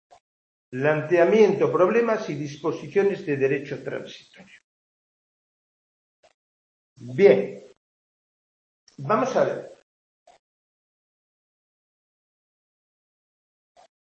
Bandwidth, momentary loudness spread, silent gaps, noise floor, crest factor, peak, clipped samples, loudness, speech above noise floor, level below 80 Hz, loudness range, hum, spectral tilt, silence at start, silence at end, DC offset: 7.2 kHz; 18 LU; 4.64-6.23 s, 6.34-6.96 s, 7.77-8.87 s; under -90 dBFS; 24 dB; -4 dBFS; under 0.1%; -22 LUFS; over 68 dB; -74 dBFS; 11 LU; none; -7 dB/octave; 0.7 s; 4.3 s; under 0.1%